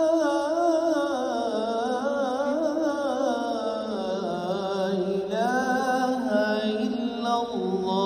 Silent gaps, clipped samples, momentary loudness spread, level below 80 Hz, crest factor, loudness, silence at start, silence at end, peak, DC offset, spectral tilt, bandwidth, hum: none; under 0.1%; 5 LU; -64 dBFS; 14 dB; -26 LUFS; 0 s; 0 s; -12 dBFS; under 0.1%; -5.5 dB/octave; 15.5 kHz; none